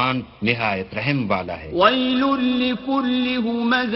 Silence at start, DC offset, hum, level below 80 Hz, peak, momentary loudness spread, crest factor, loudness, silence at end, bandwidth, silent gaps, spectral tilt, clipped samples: 0 s; under 0.1%; none; -50 dBFS; 0 dBFS; 6 LU; 20 dB; -20 LUFS; 0 s; 6 kHz; none; -8 dB/octave; under 0.1%